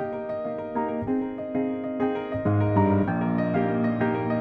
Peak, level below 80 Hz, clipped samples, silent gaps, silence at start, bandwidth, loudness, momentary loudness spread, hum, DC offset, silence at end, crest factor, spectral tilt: -10 dBFS; -54 dBFS; under 0.1%; none; 0 s; 4.7 kHz; -26 LUFS; 8 LU; none; under 0.1%; 0 s; 16 dB; -11 dB/octave